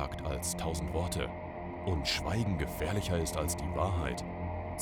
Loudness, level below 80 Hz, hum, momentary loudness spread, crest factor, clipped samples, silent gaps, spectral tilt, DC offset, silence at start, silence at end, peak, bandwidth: -34 LUFS; -44 dBFS; none; 7 LU; 16 dB; under 0.1%; none; -4.5 dB/octave; under 0.1%; 0 s; 0 s; -18 dBFS; 20 kHz